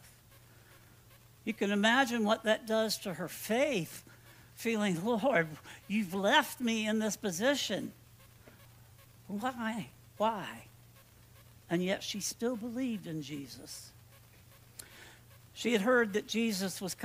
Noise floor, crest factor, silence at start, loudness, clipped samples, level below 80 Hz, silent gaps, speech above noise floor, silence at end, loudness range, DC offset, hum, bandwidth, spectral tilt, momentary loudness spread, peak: -59 dBFS; 24 dB; 0.05 s; -33 LUFS; under 0.1%; -70 dBFS; none; 26 dB; 0 s; 8 LU; under 0.1%; none; 16 kHz; -4 dB/octave; 21 LU; -12 dBFS